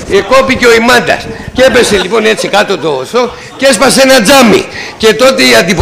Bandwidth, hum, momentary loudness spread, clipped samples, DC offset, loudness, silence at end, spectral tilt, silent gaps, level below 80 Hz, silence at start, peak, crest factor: 16.5 kHz; none; 9 LU; 0.7%; under 0.1%; -6 LUFS; 0 s; -3 dB/octave; none; -34 dBFS; 0 s; 0 dBFS; 6 dB